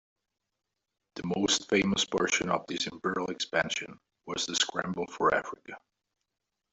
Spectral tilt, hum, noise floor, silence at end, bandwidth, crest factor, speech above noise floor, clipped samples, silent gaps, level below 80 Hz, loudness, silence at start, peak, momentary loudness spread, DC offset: -3 dB/octave; none; -86 dBFS; 0.95 s; 8.2 kHz; 20 dB; 55 dB; under 0.1%; none; -64 dBFS; -29 LUFS; 1.15 s; -12 dBFS; 17 LU; under 0.1%